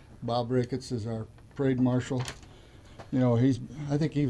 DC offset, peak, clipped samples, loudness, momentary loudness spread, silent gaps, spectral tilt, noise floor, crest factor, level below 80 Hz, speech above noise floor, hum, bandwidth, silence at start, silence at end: under 0.1%; -14 dBFS; under 0.1%; -29 LUFS; 13 LU; none; -7.5 dB/octave; -51 dBFS; 14 dB; -54 dBFS; 23 dB; none; 11 kHz; 0 s; 0 s